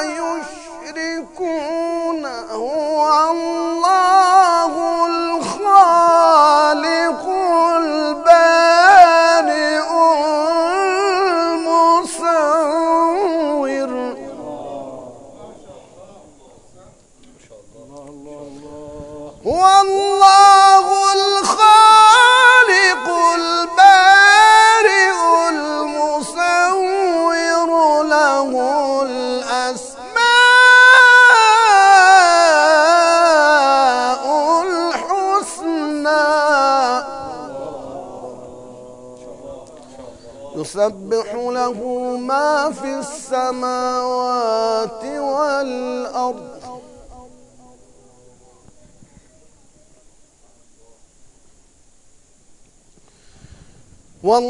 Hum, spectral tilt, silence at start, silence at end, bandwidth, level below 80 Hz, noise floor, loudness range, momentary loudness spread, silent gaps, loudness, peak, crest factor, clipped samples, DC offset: none; -1.5 dB/octave; 0 s; 0 s; 12 kHz; -54 dBFS; -50 dBFS; 16 LU; 18 LU; none; -13 LUFS; 0 dBFS; 14 dB; 0.2%; under 0.1%